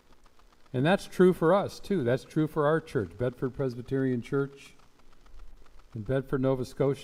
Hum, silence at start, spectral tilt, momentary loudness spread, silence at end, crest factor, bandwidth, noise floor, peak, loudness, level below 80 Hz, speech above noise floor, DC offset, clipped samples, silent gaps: none; 0.75 s; -7.5 dB/octave; 10 LU; 0 s; 20 dB; 15.5 kHz; -55 dBFS; -8 dBFS; -28 LUFS; -52 dBFS; 27 dB; under 0.1%; under 0.1%; none